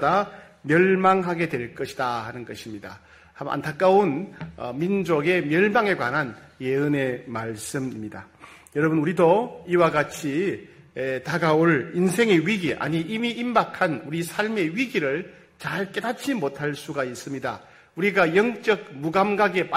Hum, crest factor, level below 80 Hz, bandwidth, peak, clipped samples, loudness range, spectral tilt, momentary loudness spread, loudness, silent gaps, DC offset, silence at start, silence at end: none; 18 dB; -62 dBFS; 16 kHz; -6 dBFS; under 0.1%; 4 LU; -6 dB/octave; 15 LU; -23 LUFS; none; under 0.1%; 0 s; 0 s